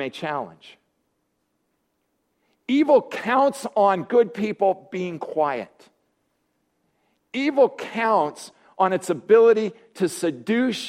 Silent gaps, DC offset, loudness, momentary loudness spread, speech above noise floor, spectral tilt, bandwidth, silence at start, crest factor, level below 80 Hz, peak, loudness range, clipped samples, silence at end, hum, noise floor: none; under 0.1%; -22 LUFS; 13 LU; 52 dB; -5 dB/octave; 14.5 kHz; 0 s; 18 dB; -72 dBFS; -4 dBFS; 5 LU; under 0.1%; 0 s; none; -73 dBFS